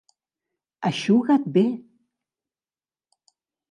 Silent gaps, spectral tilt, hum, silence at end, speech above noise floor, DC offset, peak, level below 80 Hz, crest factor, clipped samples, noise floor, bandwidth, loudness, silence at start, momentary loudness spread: none; -6.5 dB/octave; none; 1.9 s; over 70 dB; under 0.1%; -8 dBFS; -76 dBFS; 18 dB; under 0.1%; under -90 dBFS; 11 kHz; -22 LUFS; 0.8 s; 10 LU